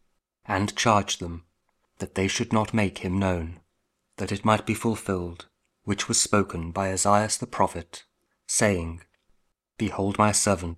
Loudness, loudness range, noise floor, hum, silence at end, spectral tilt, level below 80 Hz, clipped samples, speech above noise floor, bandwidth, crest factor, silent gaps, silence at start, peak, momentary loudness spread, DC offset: -25 LUFS; 3 LU; -75 dBFS; none; 0 s; -4 dB/octave; -50 dBFS; under 0.1%; 50 dB; 15 kHz; 22 dB; none; 0.5 s; -4 dBFS; 17 LU; under 0.1%